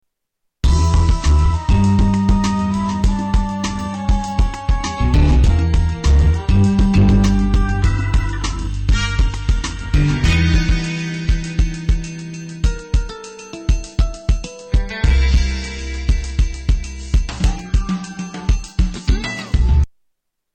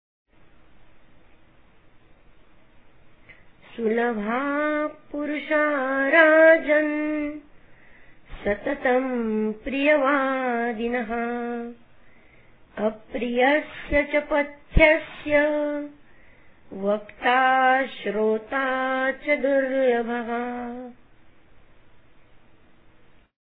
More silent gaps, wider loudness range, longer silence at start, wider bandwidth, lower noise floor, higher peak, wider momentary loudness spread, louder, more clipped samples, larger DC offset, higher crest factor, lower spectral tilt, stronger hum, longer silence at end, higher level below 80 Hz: neither; about the same, 6 LU vs 8 LU; second, 0.65 s vs 3.3 s; first, 9 kHz vs 4.4 kHz; first, -73 dBFS vs -56 dBFS; second, -6 dBFS vs -2 dBFS; second, 8 LU vs 14 LU; first, -18 LUFS vs -23 LUFS; neither; second, under 0.1% vs 0.2%; second, 10 dB vs 22 dB; second, -6 dB/octave vs -9 dB/octave; neither; second, 0.65 s vs 2.5 s; first, -18 dBFS vs -40 dBFS